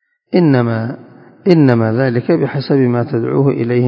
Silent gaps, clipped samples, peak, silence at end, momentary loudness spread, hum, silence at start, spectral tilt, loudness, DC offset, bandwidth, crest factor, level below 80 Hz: none; under 0.1%; 0 dBFS; 0 s; 9 LU; none; 0.3 s; -10 dB/octave; -14 LUFS; under 0.1%; 5.4 kHz; 14 dB; -58 dBFS